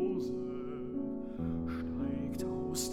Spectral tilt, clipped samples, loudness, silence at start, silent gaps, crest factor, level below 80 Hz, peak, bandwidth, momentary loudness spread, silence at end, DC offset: -5.5 dB/octave; under 0.1%; -38 LUFS; 0 s; none; 14 dB; -56 dBFS; -24 dBFS; 16.5 kHz; 4 LU; 0 s; under 0.1%